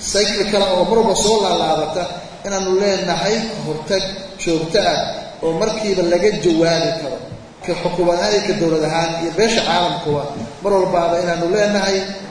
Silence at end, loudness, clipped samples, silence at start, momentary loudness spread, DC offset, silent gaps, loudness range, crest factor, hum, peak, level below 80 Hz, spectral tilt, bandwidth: 0 s; -17 LUFS; under 0.1%; 0 s; 10 LU; under 0.1%; none; 2 LU; 16 dB; none; 0 dBFS; -42 dBFS; -4 dB/octave; 10.5 kHz